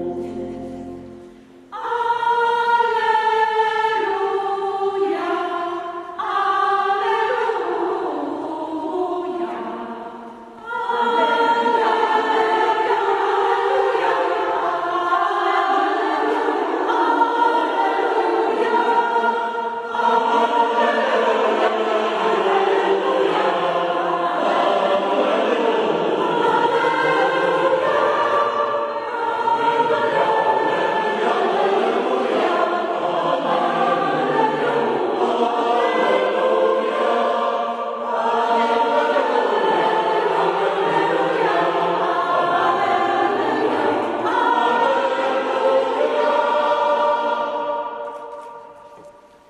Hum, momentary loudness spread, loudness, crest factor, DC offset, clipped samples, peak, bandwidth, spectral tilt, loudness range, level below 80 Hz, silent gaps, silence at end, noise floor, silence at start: none; 8 LU; -19 LUFS; 16 dB; under 0.1%; under 0.1%; -4 dBFS; 11.5 kHz; -4.5 dB/octave; 3 LU; -64 dBFS; none; 0.4 s; -45 dBFS; 0 s